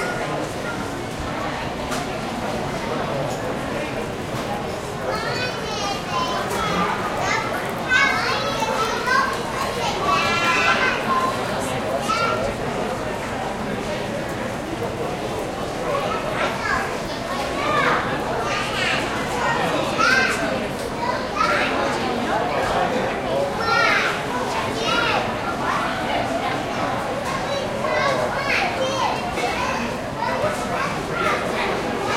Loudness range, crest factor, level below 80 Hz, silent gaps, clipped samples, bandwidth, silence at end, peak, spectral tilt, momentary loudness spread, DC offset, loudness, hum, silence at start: 6 LU; 18 dB; -44 dBFS; none; under 0.1%; 16.5 kHz; 0 s; -6 dBFS; -4 dB/octave; 8 LU; under 0.1%; -22 LUFS; none; 0 s